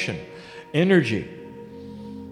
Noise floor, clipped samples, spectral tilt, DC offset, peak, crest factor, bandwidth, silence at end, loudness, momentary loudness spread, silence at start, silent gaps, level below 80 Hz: -41 dBFS; under 0.1%; -6.5 dB/octave; under 0.1%; -6 dBFS; 20 dB; 10.5 kHz; 0 s; -22 LUFS; 21 LU; 0 s; none; -58 dBFS